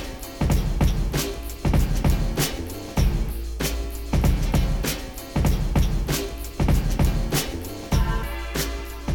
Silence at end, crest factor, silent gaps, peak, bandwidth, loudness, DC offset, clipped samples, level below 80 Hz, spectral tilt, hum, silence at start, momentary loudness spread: 0 s; 12 dB; none; -10 dBFS; 19 kHz; -25 LUFS; under 0.1%; under 0.1%; -26 dBFS; -5 dB/octave; none; 0 s; 7 LU